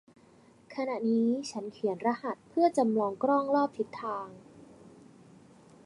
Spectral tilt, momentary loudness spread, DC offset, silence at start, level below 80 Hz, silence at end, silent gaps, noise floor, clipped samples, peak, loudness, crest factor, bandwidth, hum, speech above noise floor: -6 dB/octave; 11 LU; under 0.1%; 0.7 s; -76 dBFS; 0.95 s; none; -59 dBFS; under 0.1%; -14 dBFS; -30 LUFS; 18 dB; 11.5 kHz; none; 30 dB